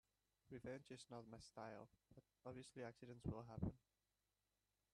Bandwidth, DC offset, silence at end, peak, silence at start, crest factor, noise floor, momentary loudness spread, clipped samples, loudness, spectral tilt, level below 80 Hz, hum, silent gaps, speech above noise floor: 11.5 kHz; under 0.1%; 1.15 s; -34 dBFS; 0.45 s; 24 dB; under -90 dBFS; 11 LU; under 0.1%; -56 LUFS; -6.5 dB/octave; -70 dBFS; none; none; over 35 dB